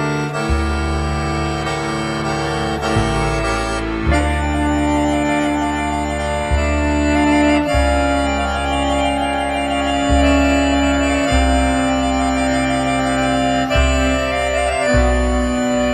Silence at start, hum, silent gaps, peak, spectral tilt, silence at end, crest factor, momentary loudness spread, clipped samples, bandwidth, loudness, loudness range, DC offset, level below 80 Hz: 0 s; none; none; -2 dBFS; -5.5 dB/octave; 0 s; 14 dB; 5 LU; under 0.1%; 12.5 kHz; -17 LUFS; 3 LU; under 0.1%; -24 dBFS